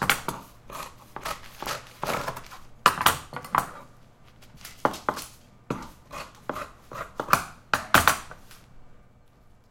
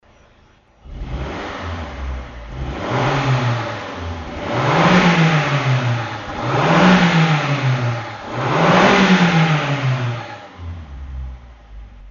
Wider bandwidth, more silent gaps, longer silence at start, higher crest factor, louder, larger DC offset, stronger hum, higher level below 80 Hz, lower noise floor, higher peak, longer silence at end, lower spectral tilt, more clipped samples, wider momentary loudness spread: first, 17 kHz vs 7.4 kHz; neither; second, 0 s vs 0.85 s; first, 30 dB vs 18 dB; second, -27 LUFS vs -17 LUFS; neither; neither; second, -52 dBFS vs -36 dBFS; first, -55 dBFS vs -51 dBFS; about the same, 0 dBFS vs 0 dBFS; first, 0.75 s vs 0 s; second, -2.5 dB/octave vs -6 dB/octave; neither; about the same, 21 LU vs 20 LU